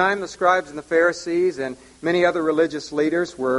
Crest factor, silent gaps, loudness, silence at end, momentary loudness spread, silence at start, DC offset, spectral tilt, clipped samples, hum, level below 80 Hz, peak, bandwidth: 16 dB; none; -21 LUFS; 0 s; 4 LU; 0 s; under 0.1%; -5 dB/octave; under 0.1%; none; -58 dBFS; -4 dBFS; 11.5 kHz